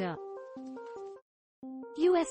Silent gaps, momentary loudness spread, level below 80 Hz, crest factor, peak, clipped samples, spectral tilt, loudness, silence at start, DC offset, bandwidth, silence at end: 1.22-1.62 s; 21 LU; -76 dBFS; 16 dB; -18 dBFS; under 0.1%; -5.5 dB/octave; -35 LUFS; 0 s; under 0.1%; 8.4 kHz; 0 s